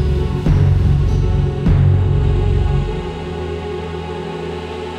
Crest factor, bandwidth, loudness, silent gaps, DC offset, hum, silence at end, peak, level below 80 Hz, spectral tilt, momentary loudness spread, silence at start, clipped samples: 12 dB; 8.2 kHz; -18 LUFS; none; under 0.1%; none; 0 s; -4 dBFS; -20 dBFS; -8.5 dB/octave; 11 LU; 0 s; under 0.1%